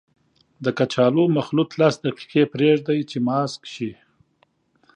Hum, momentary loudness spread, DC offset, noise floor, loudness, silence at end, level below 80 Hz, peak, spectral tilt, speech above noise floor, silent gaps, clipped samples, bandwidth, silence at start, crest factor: none; 11 LU; under 0.1%; -64 dBFS; -21 LUFS; 1.05 s; -66 dBFS; -4 dBFS; -6.5 dB/octave; 44 dB; none; under 0.1%; 9.8 kHz; 0.6 s; 18 dB